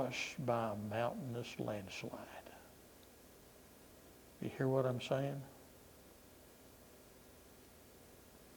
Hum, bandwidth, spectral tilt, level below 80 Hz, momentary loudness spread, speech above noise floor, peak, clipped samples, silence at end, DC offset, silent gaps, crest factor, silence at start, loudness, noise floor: 60 Hz at -70 dBFS; over 20 kHz; -6 dB/octave; -72 dBFS; 22 LU; 21 dB; -22 dBFS; under 0.1%; 0 s; under 0.1%; none; 22 dB; 0 s; -41 LUFS; -61 dBFS